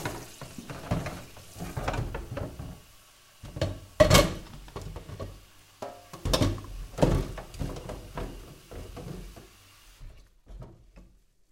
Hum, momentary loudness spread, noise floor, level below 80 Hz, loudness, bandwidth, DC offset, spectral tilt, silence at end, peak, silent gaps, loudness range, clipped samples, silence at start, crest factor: none; 23 LU; -58 dBFS; -40 dBFS; -30 LUFS; 16.5 kHz; under 0.1%; -4.5 dB/octave; 0.45 s; -2 dBFS; none; 15 LU; under 0.1%; 0 s; 30 dB